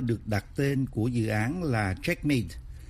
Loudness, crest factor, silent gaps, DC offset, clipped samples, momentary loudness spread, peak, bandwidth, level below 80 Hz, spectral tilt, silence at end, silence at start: -29 LUFS; 16 dB; none; under 0.1%; under 0.1%; 3 LU; -12 dBFS; 15.5 kHz; -46 dBFS; -7 dB/octave; 0 s; 0 s